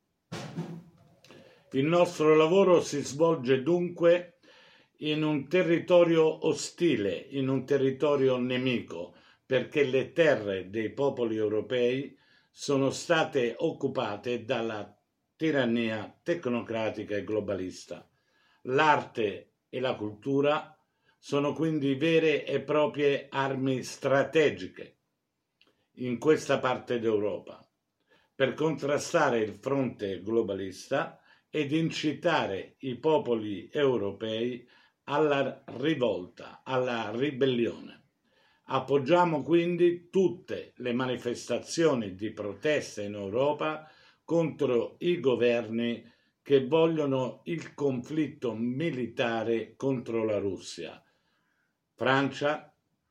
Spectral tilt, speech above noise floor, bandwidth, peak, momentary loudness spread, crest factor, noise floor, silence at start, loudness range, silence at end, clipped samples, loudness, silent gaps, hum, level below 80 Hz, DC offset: -5.5 dB/octave; 54 dB; 12.5 kHz; -8 dBFS; 12 LU; 20 dB; -81 dBFS; 0.3 s; 5 LU; 0.45 s; under 0.1%; -29 LUFS; none; none; -76 dBFS; under 0.1%